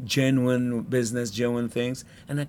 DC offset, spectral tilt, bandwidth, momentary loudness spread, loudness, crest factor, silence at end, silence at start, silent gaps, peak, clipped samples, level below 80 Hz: under 0.1%; -5.5 dB/octave; 17.5 kHz; 9 LU; -26 LUFS; 16 dB; 0 s; 0 s; none; -10 dBFS; under 0.1%; -58 dBFS